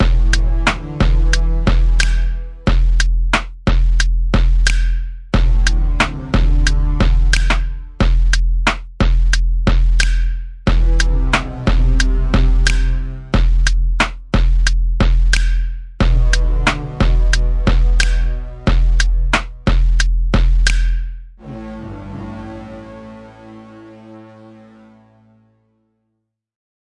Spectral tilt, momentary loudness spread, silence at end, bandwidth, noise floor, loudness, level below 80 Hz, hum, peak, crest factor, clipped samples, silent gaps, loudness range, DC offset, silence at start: -4.5 dB/octave; 14 LU; 2.75 s; 10.5 kHz; -73 dBFS; -17 LUFS; -14 dBFS; none; 0 dBFS; 14 dB; under 0.1%; none; 6 LU; under 0.1%; 0 s